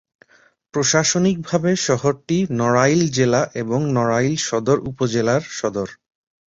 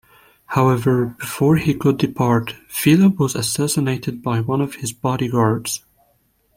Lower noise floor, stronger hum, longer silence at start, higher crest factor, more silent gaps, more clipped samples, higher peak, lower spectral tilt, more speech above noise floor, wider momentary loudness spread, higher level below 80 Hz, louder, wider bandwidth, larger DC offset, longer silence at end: second, -56 dBFS vs -62 dBFS; neither; first, 0.75 s vs 0.5 s; about the same, 18 dB vs 18 dB; neither; neither; about the same, -2 dBFS vs -2 dBFS; about the same, -4.5 dB/octave vs -5.5 dB/octave; second, 38 dB vs 44 dB; about the same, 7 LU vs 9 LU; about the same, -54 dBFS vs -50 dBFS; about the same, -19 LUFS vs -19 LUFS; second, 8 kHz vs 16.5 kHz; neither; second, 0.55 s vs 0.8 s